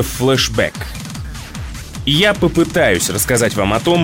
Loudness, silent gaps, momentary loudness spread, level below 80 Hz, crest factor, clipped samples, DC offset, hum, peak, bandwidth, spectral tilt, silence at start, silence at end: -14 LUFS; none; 15 LU; -32 dBFS; 12 dB; under 0.1%; under 0.1%; none; -2 dBFS; 16.5 kHz; -4 dB/octave; 0 s; 0 s